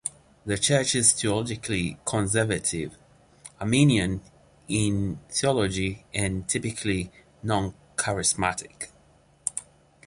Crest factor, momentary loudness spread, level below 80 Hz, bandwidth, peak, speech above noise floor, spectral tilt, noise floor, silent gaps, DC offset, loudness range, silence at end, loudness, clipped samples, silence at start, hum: 22 dB; 15 LU; -48 dBFS; 11.5 kHz; -6 dBFS; 33 dB; -4 dB/octave; -59 dBFS; none; under 0.1%; 4 LU; 0.45 s; -25 LUFS; under 0.1%; 0.05 s; none